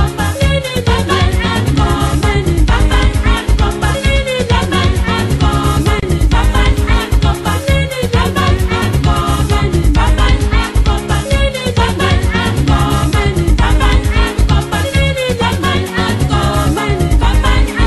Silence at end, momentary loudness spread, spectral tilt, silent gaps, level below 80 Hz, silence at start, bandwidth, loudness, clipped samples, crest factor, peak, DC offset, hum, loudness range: 0 s; 2 LU; -5.5 dB/octave; none; -14 dBFS; 0 s; 12.5 kHz; -13 LUFS; under 0.1%; 10 dB; 0 dBFS; under 0.1%; none; 1 LU